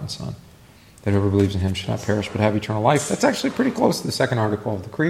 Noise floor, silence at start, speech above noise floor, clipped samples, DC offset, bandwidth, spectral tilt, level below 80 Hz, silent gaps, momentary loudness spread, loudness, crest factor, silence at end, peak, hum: -48 dBFS; 0 s; 27 dB; under 0.1%; under 0.1%; 15 kHz; -5.5 dB/octave; -50 dBFS; none; 10 LU; -22 LUFS; 18 dB; 0 s; -2 dBFS; none